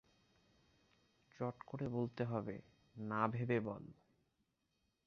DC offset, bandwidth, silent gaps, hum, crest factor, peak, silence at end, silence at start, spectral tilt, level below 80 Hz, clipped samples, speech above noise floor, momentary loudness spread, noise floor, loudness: under 0.1%; 6.6 kHz; none; none; 24 dB; -20 dBFS; 1.15 s; 1.4 s; -7.5 dB/octave; -74 dBFS; under 0.1%; 42 dB; 14 LU; -84 dBFS; -42 LUFS